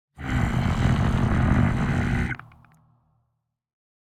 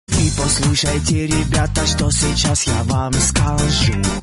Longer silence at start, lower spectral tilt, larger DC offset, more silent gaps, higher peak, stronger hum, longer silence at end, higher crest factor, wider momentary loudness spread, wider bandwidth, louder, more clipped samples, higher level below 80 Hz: about the same, 0.2 s vs 0.1 s; first, -7.5 dB/octave vs -4 dB/octave; neither; neither; second, -8 dBFS vs -2 dBFS; neither; first, 1.7 s vs 0 s; about the same, 18 dB vs 14 dB; first, 7 LU vs 2 LU; about the same, 10.5 kHz vs 11.5 kHz; second, -24 LUFS vs -16 LUFS; neither; second, -32 dBFS vs -24 dBFS